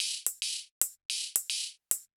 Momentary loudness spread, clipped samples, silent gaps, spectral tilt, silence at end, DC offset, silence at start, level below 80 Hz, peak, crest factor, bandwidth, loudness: 4 LU; under 0.1%; 0.71-0.81 s, 1.05-1.09 s; 4.5 dB/octave; 0.1 s; under 0.1%; 0 s; -80 dBFS; -4 dBFS; 32 dB; over 20 kHz; -32 LUFS